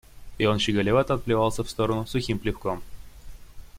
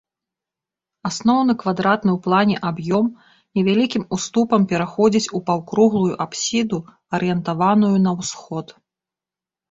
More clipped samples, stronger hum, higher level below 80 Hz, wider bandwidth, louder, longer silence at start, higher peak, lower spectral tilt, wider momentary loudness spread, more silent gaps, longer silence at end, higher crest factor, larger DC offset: neither; neither; first, -42 dBFS vs -58 dBFS; first, 16.5 kHz vs 8 kHz; second, -25 LUFS vs -19 LUFS; second, 0.15 s vs 1.05 s; second, -8 dBFS vs -2 dBFS; about the same, -5.5 dB/octave vs -5.5 dB/octave; about the same, 8 LU vs 10 LU; neither; second, 0 s vs 1 s; about the same, 18 dB vs 18 dB; neither